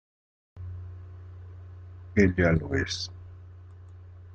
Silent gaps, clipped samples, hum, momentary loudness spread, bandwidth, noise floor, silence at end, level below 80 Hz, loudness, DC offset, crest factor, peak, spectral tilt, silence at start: none; under 0.1%; none; 25 LU; 8.6 kHz; -47 dBFS; 0 s; -50 dBFS; -26 LUFS; under 0.1%; 22 dB; -8 dBFS; -6 dB/octave; 0.55 s